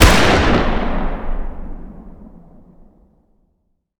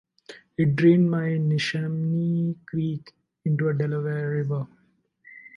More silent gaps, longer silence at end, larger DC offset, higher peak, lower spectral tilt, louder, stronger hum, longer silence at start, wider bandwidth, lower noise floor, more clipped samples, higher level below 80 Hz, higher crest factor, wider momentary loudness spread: neither; first, 1.4 s vs 0.1 s; neither; first, 0 dBFS vs -8 dBFS; second, -4.5 dB/octave vs -8 dB/octave; first, -17 LUFS vs -24 LUFS; neither; second, 0 s vs 0.3 s; first, over 20 kHz vs 7.2 kHz; about the same, -66 dBFS vs -64 dBFS; first, 0.1% vs under 0.1%; first, -22 dBFS vs -64 dBFS; about the same, 18 dB vs 18 dB; first, 25 LU vs 13 LU